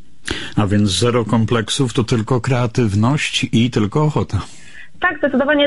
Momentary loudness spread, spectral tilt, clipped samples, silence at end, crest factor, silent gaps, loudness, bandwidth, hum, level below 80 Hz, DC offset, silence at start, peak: 6 LU; -5.5 dB/octave; under 0.1%; 0 s; 14 dB; none; -17 LUFS; 11.5 kHz; none; -38 dBFS; 2%; 0.25 s; -4 dBFS